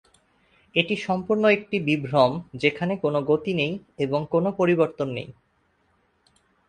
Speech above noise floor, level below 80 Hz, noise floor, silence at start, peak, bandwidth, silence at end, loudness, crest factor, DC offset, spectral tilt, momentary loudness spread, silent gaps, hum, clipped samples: 44 dB; -62 dBFS; -67 dBFS; 0.75 s; -4 dBFS; 9.8 kHz; 1.35 s; -23 LUFS; 22 dB; under 0.1%; -7 dB/octave; 8 LU; none; none; under 0.1%